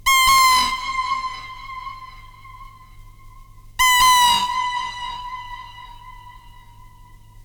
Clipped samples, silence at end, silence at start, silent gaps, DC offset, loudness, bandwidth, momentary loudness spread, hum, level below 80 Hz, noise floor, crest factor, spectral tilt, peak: under 0.1%; 0.55 s; 0.05 s; none; under 0.1%; -16 LUFS; over 20 kHz; 23 LU; none; -42 dBFS; -45 dBFS; 16 dB; 1.5 dB/octave; -6 dBFS